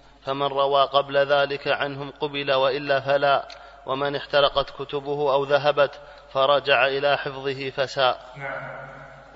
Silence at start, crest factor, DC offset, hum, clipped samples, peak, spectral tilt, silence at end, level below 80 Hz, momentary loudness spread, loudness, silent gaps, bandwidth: 0.25 s; 18 dB; under 0.1%; none; under 0.1%; -4 dBFS; -5 dB/octave; 0.1 s; -54 dBFS; 13 LU; -23 LUFS; none; 7.8 kHz